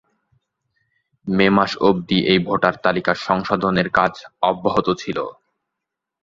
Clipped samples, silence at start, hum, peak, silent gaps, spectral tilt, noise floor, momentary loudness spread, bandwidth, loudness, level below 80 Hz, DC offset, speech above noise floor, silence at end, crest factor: under 0.1%; 1.25 s; none; 0 dBFS; none; -6.5 dB/octave; -82 dBFS; 8 LU; 7.4 kHz; -19 LUFS; -52 dBFS; under 0.1%; 64 dB; 0.9 s; 20 dB